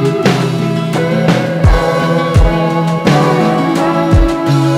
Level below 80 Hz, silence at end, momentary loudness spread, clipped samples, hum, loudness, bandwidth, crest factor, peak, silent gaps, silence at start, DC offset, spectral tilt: -20 dBFS; 0 s; 3 LU; under 0.1%; none; -12 LUFS; 14 kHz; 10 dB; -2 dBFS; none; 0 s; under 0.1%; -7 dB/octave